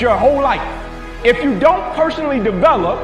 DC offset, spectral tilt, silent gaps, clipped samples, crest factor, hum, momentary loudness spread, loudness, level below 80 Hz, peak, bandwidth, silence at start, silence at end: 0.3%; -6.5 dB/octave; none; under 0.1%; 14 dB; none; 10 LU; -15 LUFS; -32 dBFS; 0 dBFS; 11 kHz; 0 s; 0 s